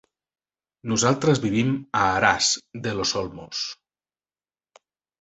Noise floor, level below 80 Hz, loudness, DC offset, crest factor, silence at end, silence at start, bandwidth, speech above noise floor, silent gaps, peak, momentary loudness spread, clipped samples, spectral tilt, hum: under -90 dBFS; -54 dBFS; -23 LUFS; under 0.1%; 22 dB; 1.45 s; 0.85 s; 8.4 kHz; over 67 dB; none; -2 dBFS; 11 LU; under 0.1%; -3.5 dB/octave; none